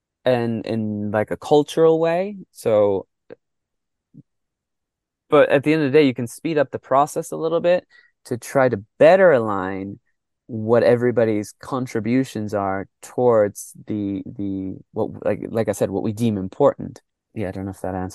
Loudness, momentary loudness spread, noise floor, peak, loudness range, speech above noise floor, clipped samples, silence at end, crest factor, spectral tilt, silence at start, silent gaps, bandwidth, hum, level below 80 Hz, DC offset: -20 LUFS; 14 LU; -82 dBFS; -2 dBFS; 5 LU; 62 dB; under 0.1%; 0 s; 18 dB; -6.5 dB/octave; 0.25 s; none; 12.5 kHz; none; -62 dBFS; under 0.1%